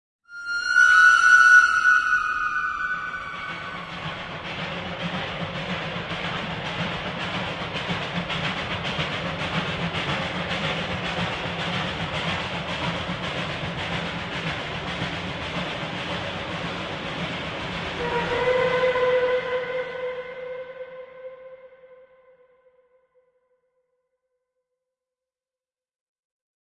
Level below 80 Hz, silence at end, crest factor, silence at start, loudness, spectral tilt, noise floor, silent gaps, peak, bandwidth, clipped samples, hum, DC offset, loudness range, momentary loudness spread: -50 dBFS; 4.6 s; 22 dB; 0.3 s; -23 LUFS; -4 dB/octave; under -90 dBFS; none; -4 dBFS; 11 kHz; under 0.1%; none; under 0.1%; 12 LU; 15 LU